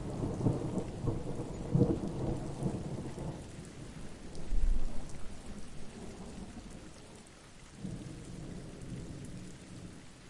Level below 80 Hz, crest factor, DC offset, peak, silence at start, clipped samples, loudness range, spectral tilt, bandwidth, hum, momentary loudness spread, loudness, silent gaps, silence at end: -42 dBFS; 20 dB; under 0.1%; -14 dBFS; 0 s; under 0.1%; 12 LU; -7 dB/octave; 11.5 kHz; none; 16 LU; -40 LUFS; none; 0 s